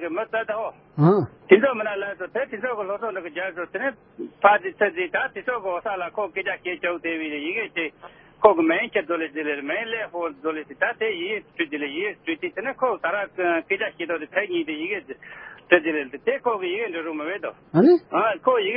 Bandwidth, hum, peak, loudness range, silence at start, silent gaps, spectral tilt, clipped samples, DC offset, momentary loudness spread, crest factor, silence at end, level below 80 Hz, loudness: 5 kHz; none; 0 dBFS; 4 LU; 0 s; none; -10.5 dB/octave; under 0.1%; under 0.1%; 11 LU; 24 dB; 0 s; -66 dBFS; -24 LUFS